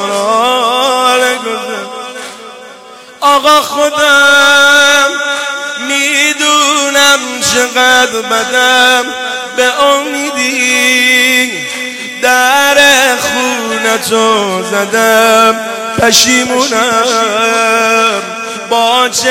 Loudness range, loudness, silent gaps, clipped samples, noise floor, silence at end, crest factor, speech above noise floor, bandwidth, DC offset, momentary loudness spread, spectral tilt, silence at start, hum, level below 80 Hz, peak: 2 LU; -8 LUFS; none; 0.2%; -33 dBFS; 0 s; 10 dB; 24 dB; 18.5 kHz; under 0.1%; 11 LU; -1 dB/octave; 0 s; none; -50 dBFS; 0 dBFS